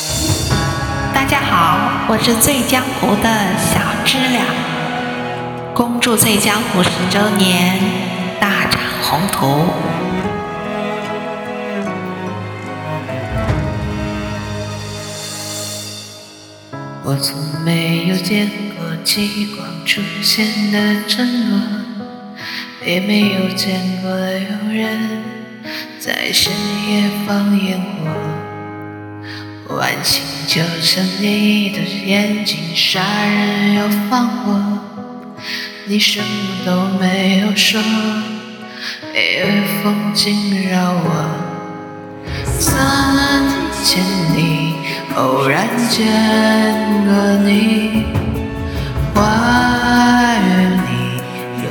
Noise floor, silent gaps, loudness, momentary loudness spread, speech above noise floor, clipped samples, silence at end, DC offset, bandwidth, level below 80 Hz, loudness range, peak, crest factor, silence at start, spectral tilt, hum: -37 dBFS; none; -16 LUFS; 13 LU; 23 dB; under 0.1%; 0 s; under 0.1%; 19.5 kHz; -36 dBFS; 8 LU; 0 dBFS; 16 dB; 0 s; -4 dB/octave; none